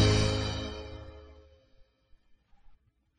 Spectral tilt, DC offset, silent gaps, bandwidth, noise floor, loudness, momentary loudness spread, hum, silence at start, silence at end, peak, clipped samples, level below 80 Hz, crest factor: -5 dB/octave; under 0.1%; none; 10.5 kHz; -63 dBFS; -31 LUFS; 23 LU; none; 0 s; 0.45 s; -12 dBFS; under 0.1%; -42 dBFS; 22 dB